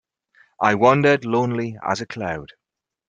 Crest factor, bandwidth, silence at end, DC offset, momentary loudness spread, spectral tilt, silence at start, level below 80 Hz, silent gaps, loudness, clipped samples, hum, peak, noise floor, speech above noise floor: 20 dB; 9.2 kHz; 0.6 s; under 0.1%; 13 LU; -6.5 dB/octave; 0.6 s; -58 dBFS; none; -20 LUFS; under 0.1%; none; 0 dBFS; -58 dBFS; 39 dB